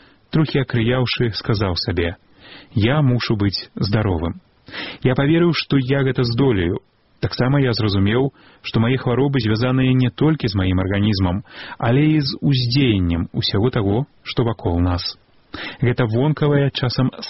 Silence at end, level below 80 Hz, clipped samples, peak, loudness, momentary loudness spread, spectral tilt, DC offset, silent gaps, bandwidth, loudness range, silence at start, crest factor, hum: 0 s; -40 dBFS; under 0.1%; -4 dBFS; -19 LUFS; 9 LU; -5.5 dB/octave; 0.4%; none; 6 kHz; 2 LU; 0.3 s; 14 dB; none